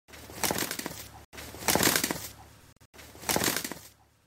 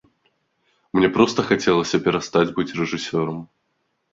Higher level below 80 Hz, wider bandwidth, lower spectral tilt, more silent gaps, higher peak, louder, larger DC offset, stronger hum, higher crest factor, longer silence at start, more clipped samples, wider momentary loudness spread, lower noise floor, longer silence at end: about the same, -56 dBFS vs -54 dBFS; first, 16.5 kHz vs 7.8 kHz; second, -2 dB/octave vs -5.5 dB/octave; first, 1.25-1.33 s, 2.85-2.93 s vs none; second, -6 dBFS vs -2 dBFS; second, -29 LUFS vs -20 LUFS; neither; neither; first, 26 dB vs 20 dB; second, 0.1 s vs 0.95 s; neither; first, 21 LU vs 8 LU; second, -53 dBFS vs -72 dBFS; second, 0.4 s vs 0.65 s